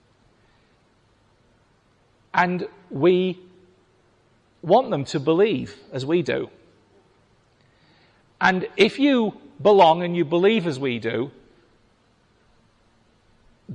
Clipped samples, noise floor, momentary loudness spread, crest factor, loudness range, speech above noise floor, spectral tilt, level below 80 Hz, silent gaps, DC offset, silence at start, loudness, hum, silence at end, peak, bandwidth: under 0.1%; -61 dBFS; 13 LU; 18 dB; 7 LU; 41 dB; -6.5 dB/octave; -64 dBFS; none; under 0.1%; 2.35 s; -21 LUFS; none; 0 s; -6 dBFS; 9.6 kHz